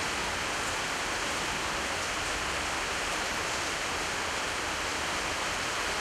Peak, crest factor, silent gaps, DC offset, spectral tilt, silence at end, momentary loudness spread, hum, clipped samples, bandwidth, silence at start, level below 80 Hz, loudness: -18 dBFS; 14 dB; none; under 0.1%; -1.5 dB/octave; 0 s; 1 LU; none; under 0.1%; 16 kHz; 0 s; -50 dBFS; -30 LUFS